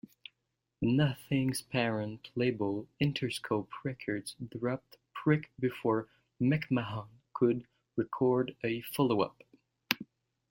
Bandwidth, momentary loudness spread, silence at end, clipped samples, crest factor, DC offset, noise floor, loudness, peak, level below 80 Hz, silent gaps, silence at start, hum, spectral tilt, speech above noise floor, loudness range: 16.5 kHz; 11 LU; 0.45 s; under 0.1%; 28 dB; under 0.1%; -84 dBFS; -33 LUFS; -6 dBFS; -66 dBFS; none; 0.8 s; none; -6.5 dB/octave; 52 dB; 2 LU